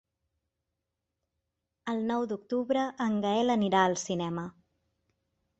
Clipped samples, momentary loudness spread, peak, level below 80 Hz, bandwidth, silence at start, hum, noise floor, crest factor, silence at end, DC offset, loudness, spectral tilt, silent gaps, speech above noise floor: under 0.1%; 10 LU; -10 dBFS; -70 dBFS; 8.2 kHz; 1.85 s; none; -85 dBFS; 20 dB; 1.1 s; under 0.1%; -29 LUFS; -5 dB/octave; none; 57 dB